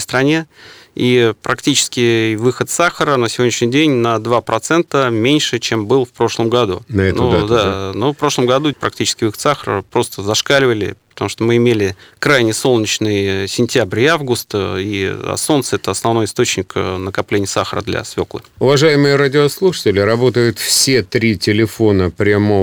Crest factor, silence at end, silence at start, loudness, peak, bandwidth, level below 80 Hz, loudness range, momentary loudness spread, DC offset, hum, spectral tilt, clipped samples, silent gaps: 14 dB; 0 s; 0 s; -15 LUFS; 0 dBFS; over 20 kHz; -46 dBFS; 3 LU; 7 LU; under 0.1%; none; -4.5 dB/octave; under 0.1%; none